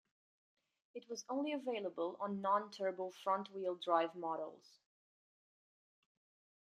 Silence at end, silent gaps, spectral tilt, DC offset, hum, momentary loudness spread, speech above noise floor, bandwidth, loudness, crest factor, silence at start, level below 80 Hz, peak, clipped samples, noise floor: 2.05 s; none; -4.5 dB/octave; under 0.1%; none; 12 LU; over 50 dB; 13.5 kHz; -40 LUFS; 22 dB; 0.95 s; under -90 dBFS; -20 dBFS; under 0.1%; under -90 dBFS